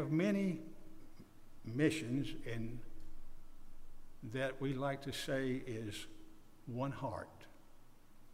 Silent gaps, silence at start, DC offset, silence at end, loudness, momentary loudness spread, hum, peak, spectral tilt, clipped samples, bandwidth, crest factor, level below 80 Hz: none; 0 s; under 0.1%; 0 s; -40 LUFS; 25 LU; none; -22 dBFS; -6 dB/octave; under 0.1%; 15.5 kHz; 20 dB; -54 dBFS